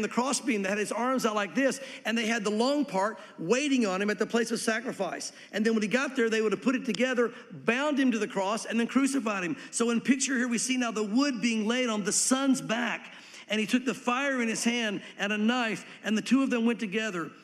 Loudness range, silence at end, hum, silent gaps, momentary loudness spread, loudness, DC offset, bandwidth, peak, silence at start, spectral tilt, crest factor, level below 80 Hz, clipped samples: 2 LU; 0.1 s; none; none; 6 LU; -28 LUFS; under 0.1%; 14 kHz; -12 dBFS; 0 s; -3.5 dB/octave; 18 dB; -82 dBFS; under 0.1%